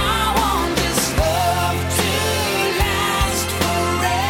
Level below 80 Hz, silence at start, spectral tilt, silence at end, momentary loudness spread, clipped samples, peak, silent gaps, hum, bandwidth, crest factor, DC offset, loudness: -30 dBFS; 0 s; -3.5 dB/octave; 0 s; 2 LU; under 0.1%; -6 dBFS; none; none; 17.5 kHz; 14 dB; under 0.1%; -18 LUFS